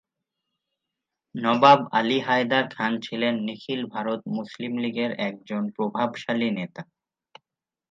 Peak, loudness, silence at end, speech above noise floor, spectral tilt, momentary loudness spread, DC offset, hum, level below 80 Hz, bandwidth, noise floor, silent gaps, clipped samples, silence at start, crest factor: -2 dBFS; -24 LUFS; 1.05 s; 64 dB; -6 dB/octave; 13 LU; under 0.1%; none; -76 dBFS; 7.6 kHz; -89 dBFS; none; under 0.1%; 1.35 s; 24 dB